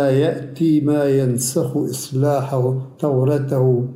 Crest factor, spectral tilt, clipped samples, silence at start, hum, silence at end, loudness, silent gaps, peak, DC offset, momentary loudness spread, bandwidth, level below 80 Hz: 12 dB; -6.5 dB/octave; under 0.1%; 0 s; none; 0 s; -19 LUFS; none; -6 dBFS; under 0.1%; 5 LU; 16 kHz; -62 dBFS